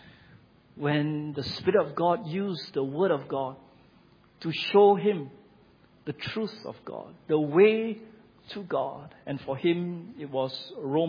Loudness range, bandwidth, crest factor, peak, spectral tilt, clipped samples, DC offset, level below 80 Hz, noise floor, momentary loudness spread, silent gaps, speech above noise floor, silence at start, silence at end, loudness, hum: 2 LU; 5.2 kHz; 20 dB; -8 dBFS; -8 dB/octave; under 0.1%; under 0.1%; -68 dBFS; -59 dBFS; 20 LU; none; 32 dB; 0.75 s; 0 s; -27 LUFS; none